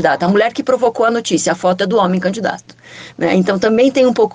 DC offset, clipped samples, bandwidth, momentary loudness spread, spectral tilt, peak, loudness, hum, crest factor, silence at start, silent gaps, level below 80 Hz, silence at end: under 0.1%; under 0.1%; 9.6 kHz; 9 LU; -5 dB/octave; 0 dBFS; -14 LUFS; none; 14 dB; 0 s; none; -56 dBFS; 0.05 s